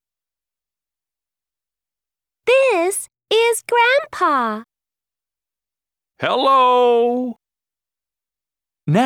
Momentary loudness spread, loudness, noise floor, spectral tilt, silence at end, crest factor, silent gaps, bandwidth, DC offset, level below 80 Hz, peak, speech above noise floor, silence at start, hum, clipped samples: 12 LU; -16 LUFS; under -90 dBFS; -4 dB/octave; 0 s; 18 dB; none; 16.5 kHz; under 0.1%; -70 dBFS; -2 dBFS; over 74 dB; 2.45 s; none; under 0.1%